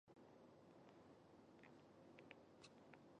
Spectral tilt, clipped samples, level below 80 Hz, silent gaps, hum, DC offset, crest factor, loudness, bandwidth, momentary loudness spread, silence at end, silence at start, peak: -5.5 dB/octave; under 0.1%; under -90 dBFS; none; none; under 0.1%; 26 dB; -67 LUFS; 8.2 kHz; 3 LU; 0 s; 0.05 s; -40 dBFS